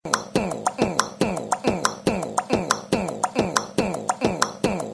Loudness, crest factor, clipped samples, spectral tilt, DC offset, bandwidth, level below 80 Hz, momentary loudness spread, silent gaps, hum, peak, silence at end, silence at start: -24 LUFS; 20 dB; under 0.1%; -4 dB/octave; under 0.1%; 11 kHz; -48 dBFS; 3 LU; none; none; -4 dBFS; 0 s; 0.05 s